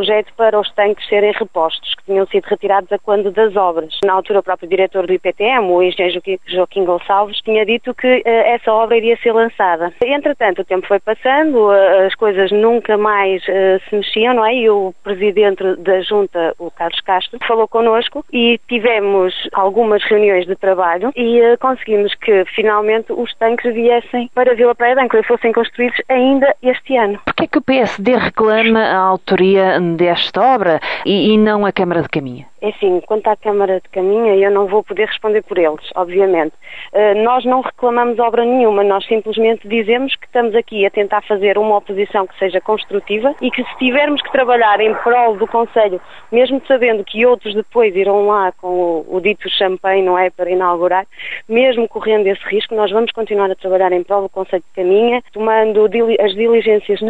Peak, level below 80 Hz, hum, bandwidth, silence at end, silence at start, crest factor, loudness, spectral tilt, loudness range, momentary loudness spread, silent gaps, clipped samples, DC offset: 0 dBFS; -52 dBFS; none; 7.4 kHz; 0 s; 0 s; 14 dB; -14 LUFS; -6.5 dB/octave; 3 LU; 6 LU; none; under 0.1%; 1%